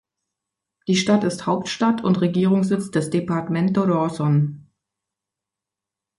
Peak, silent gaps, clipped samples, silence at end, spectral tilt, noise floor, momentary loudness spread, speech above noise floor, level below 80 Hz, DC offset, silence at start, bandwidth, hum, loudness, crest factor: -6 dBFS; none; under 0.1%; 1.6 s; -6.5 dB/octave; -87 dBFS; 5 LU; 67 dB; -60 dBFS; under 0.1%; 0.9 s; 11.5 kHz; none; -21 LUFS; 16 dB